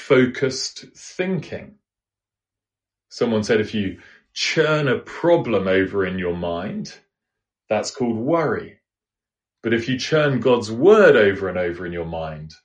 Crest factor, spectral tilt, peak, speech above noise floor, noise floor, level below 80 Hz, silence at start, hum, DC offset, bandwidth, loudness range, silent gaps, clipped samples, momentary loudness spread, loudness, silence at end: 20 dB; -5.5 dB/octave; -2 dBFS; 70 dB; -90 dBFS; -54 dBFS; 0 s; none; under 0.1%; 9.8 kHz; 8 LU; none; under 0.1%; 14 LU; -20 LUFS; 0.15 s